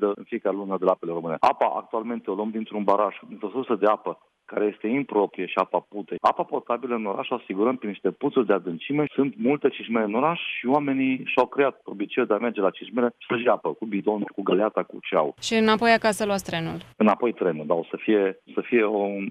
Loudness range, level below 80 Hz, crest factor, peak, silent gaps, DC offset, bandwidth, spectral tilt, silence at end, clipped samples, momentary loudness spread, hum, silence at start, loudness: 3 LU; -68 dBFS; 18 dB; -6 dBFS; none; under 0.1%; 13.5 kHz; -5.5 dB/octave; 0 s; under 0.1%; 8 LU; none; 0 s; -25 LUFS